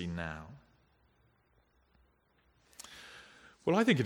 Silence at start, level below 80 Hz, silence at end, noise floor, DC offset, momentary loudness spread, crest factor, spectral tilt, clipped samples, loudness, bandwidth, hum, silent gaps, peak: 0 s; -64 dBFS; 0 s; -71 dBFS; under 0.1%; 24 LU; 24 dB; -6 dB/octave; under 0.1%; -33 LUFS; 15.5 kHz; none; none; -14 dBFS